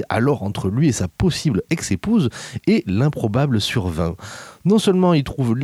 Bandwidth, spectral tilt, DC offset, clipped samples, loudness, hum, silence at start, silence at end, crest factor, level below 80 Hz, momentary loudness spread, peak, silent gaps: 14.5 kHz; -6 dB/octave; under 0.1%; under 0.1%; -19 LUFS; none; 0 s; 0 s; 14 dB; -42 dBFS; 8 LU; -6 dBFS; none